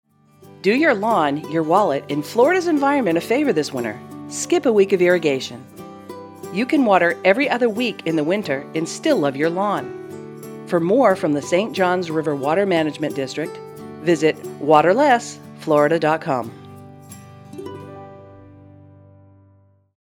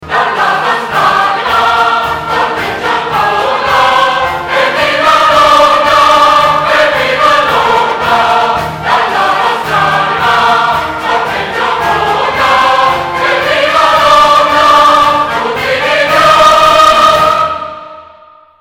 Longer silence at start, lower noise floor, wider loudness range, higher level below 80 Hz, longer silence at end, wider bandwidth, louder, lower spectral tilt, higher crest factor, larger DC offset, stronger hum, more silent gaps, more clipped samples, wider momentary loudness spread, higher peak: first, 0.65 s vs 0 s; first, -55 dBFS vs -39 dBFS; about the same, 4 LU vs 4 LU; second, -70 dBFS vs -38 dBFS; first, 1.7 s vs 0.55 s; about the same, 19 kHz vs 18.5 kHz; second, -19 LUFS vs -8 LUFS; first, -5 dB/octave vs -3 dB/octave; first, 20 dB vs 8 dB; neither; neither; neither; second, under 0.1% vs 0.6%; first, 20 LU vs 8 LU; about the same, 0 dBFS vs 0 dBFS